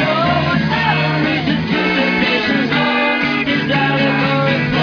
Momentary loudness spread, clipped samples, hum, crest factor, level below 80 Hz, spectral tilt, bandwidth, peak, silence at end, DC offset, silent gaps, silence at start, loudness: 2 LU; under 0.1%; none; 12 dB; -42 dBFS; -6.5 dB/octave; 5.4 kHz; -2 dBFS; 0 s; under 0.1%; none; 0 s; -15 LUFS